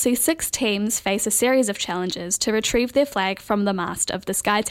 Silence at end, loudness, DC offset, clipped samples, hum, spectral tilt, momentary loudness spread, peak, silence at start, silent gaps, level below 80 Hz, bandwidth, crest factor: 0 s; -21 LUFS; under 0.1%; under 0.1%; none; -3 dB/octave; 5 LU; -4 dBFS; 0 s; none; -48 dBFS; 16.5 kHz; 18 dB